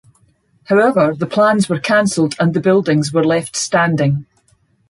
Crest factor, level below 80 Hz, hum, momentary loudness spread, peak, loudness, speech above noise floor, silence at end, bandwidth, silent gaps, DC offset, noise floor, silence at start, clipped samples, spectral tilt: 14 dB; -56 dBFS; none; 4 LU; -2 dBFS; -15 LUFS; 43 dB; 0.65 s; 11.5 kHz; none; under 0.1%; -57 dBFS; 0.7 s; under 0.1%; -5.5 dB/octave